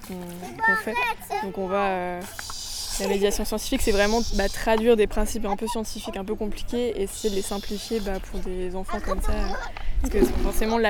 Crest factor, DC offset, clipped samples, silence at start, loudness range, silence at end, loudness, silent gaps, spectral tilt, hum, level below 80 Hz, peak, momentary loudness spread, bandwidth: 18 dB; under 0.1%; under 0.1%; 0 s; 6 LU; 0 s; -26 LUFS; none; -4 dB/octave; none; -30 dBFS; -6 dBFS; 11 LU; 19.5 kHz